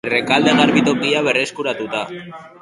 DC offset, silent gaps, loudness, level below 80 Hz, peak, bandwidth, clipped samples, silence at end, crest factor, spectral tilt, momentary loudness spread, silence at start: under 0.1%; none; -16 LUFS; -58 dBFS; 0 dBFS; 11.5 kHz; under 0.1%; 0.15 s; 18 dB; -4.5 dB/octave; 15 LU; 0.05 s